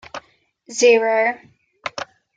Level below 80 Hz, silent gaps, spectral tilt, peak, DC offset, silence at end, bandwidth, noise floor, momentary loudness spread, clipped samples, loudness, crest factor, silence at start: -68 dBFS; none; -1.5 dB/octave; -4 dBFS; under 0.1%; 0.3 s; 9.2 kHz; -58 dBFS; 22 LU; under 0.1%; -17 LUFS; 18 dB; 0.15 s